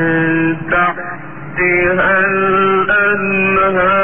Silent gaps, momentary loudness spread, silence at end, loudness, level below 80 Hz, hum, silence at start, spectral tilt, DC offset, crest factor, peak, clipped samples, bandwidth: none; 8 LU; 0 s; -12 LUFS; -40 dBFS; none; 0 s; -10 dB/octave; 2%; 12 dB; -2 dBFS; under 0.1%; 3.8 kHz